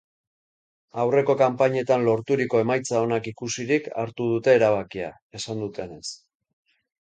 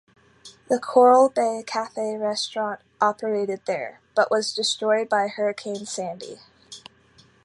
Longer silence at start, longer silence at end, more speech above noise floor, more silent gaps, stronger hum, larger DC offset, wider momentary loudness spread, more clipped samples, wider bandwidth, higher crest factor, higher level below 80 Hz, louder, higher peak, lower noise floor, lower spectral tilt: first, 0.95 s vs 0.45 s; first, 0.9 s vs 0.65 s; first, over 67 dB vs 34 dB; first, 5.22-5.30 s vs none; neither; neither; about the same, 15 LU vs 16 LU; neither; second, 9.4 kHz vs 11.5 kHz; about the same, 18 dB vs 20 dB; first, -64 dBFS vs -72 dBFS; about the same, -23 LUFS vs -23 LUFS; about the same, -6 dBFS vs -4 dBFS; first, under -90 dBFS vs -56 dBFS; first, -5.5 dB/octave vs -3 dB/octave